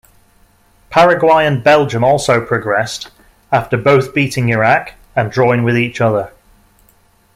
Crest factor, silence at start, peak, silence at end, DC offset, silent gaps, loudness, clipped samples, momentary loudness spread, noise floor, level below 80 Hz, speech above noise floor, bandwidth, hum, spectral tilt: 14 dB; 0.9 s; 0 dBFS; 1.05 s; under 0.1%; none; -13 LUFS; under 0.1%; 9 LU; -52 dBFS; -46 dBFS; 39 dB; 15.5 kHz; none; -6 dB/octave